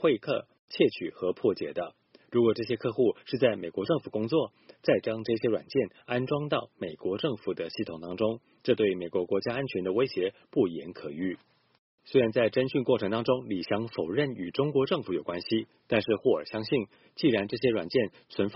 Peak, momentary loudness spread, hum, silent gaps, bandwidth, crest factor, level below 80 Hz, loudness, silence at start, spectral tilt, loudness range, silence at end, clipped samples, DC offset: -10 dBFS; 8 LU; none; 0.59-0.68 s, 11.79-11.98 s; 5.8 kHz; 20 dB; -66 dBFS; -29 LUFS; 0 s; -5 dB/octave; 2 LU; 0 s; under 0.1%; under 0.1%